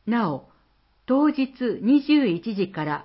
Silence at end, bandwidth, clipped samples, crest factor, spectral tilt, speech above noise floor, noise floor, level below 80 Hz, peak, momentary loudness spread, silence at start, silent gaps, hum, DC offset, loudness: 0 s; 5.8 kHz; under 0.1%; 14 dB; -11 dB/octave; 41 dB; -63 dBFS; -64 dBFS; -10 dBFS; 9 LU; 0.05 s; none; none; under 0.1%; -23 LUFS